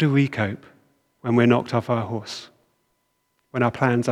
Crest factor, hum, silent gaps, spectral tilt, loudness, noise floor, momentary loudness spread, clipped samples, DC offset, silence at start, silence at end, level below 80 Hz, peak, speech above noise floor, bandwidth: 20 dB; none; none; -7 dB/octave; -22 LUFS; -71 dBFS; 16 LU; under 0.1%; under 0.1%; 0 s; 0 s; -64 dBFS; -4 dBFS; 50 dB; 11.5 kHz